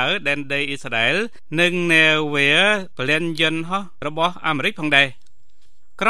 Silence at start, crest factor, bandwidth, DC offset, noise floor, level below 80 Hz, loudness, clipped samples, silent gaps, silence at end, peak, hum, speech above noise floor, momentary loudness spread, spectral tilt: 0 s; 20 dB; 14 kHz; 3%; -62 dBFS; -60 dBFS; -18 LUFS; under 0.1%; none; 0 s; 0 dBFS; none; 42 dB; 9 LU; -4 dB/octave